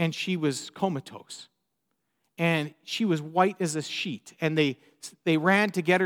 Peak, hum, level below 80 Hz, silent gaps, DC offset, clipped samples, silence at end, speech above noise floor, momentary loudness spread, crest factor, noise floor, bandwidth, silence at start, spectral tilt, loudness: -8 dBFS; none; -80 dBFS; none; under 0.1%; under 0.1%; 0 s; 52 dB; 18 LU; 20 dB; -79 dBFS; 16.5 kHz; 0 s; -5 dB/octave; -27 LUFS